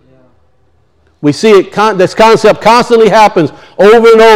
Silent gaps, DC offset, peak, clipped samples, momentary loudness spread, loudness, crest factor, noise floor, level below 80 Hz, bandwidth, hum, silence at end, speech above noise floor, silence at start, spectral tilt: none; under 0.1%; 0 dBFS; 7%; 10 LU; -6 LUFS; 6 dB; -52 dBFS; -40 dBFS; 15 kHz; none; 0 s; 47 dB; 1.25 s; -5 dB/octave